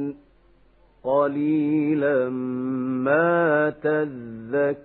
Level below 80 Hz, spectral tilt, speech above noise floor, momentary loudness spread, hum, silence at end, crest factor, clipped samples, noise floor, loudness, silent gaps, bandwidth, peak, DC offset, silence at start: -64 dBFS; -11.5 dB/octave; 34 dB; 9 LU; none; 0 s; 16 dB; under 0.1%; -57 dBFS; -23 LUFS; none; 4.1 kHz; -8 dBFS; under 0.1%; 0 s